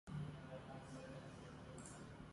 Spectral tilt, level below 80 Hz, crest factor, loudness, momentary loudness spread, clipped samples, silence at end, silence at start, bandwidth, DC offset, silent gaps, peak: -6 dB/octave; -68 dBFS; 16 dB; -54 LUFS; 6 LU; under 0.1%; 0 s; 0.05 s; 11.5 kHz; under 0.1%; none; -38 dBFS